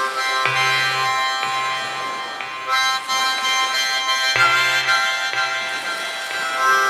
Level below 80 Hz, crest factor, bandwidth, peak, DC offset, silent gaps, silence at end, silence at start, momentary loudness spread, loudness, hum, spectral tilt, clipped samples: -64 dBFS; 18 dB; 16 kHz; -2 dBFS; under 0.1%; none; 0 s; 0 s; 9 LU; -18 LUFS; none; 0 dB/octave; under 0.1%